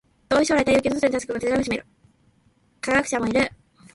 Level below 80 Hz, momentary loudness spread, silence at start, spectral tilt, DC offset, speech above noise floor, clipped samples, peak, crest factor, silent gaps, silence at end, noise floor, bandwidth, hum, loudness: -50 dBFS; 8 LU; 0.3 s; -4 dB/octave; under 0.1%; 40 dB; under 0.1%; -6 dBFS; 18 dB; none; 0.4 s; -62 dBFS; 11.5 kHz; none; -22 LUFS